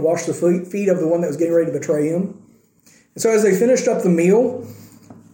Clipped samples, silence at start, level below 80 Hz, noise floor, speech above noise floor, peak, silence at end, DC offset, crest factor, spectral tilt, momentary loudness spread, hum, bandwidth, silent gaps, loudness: under 0.1%; 0 s; -68 dBFS; -53 dBFS; 36 dB; -4 dBFS; 0.2 s; under 0.1%; 14 dB; -6 dB/octave; 8 LU; none; 17 kHz; none; -18 LUFS